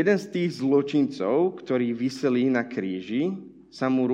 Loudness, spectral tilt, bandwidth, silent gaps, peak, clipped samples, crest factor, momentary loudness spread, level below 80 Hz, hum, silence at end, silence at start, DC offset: -25 LUFS; -7 dB/octave; 9.4 kHz; none; -10 dBFS; under 0.1%; 16 dB; 7 LU; -70 dBFS; none; 0 s; 0 s; under 0.1%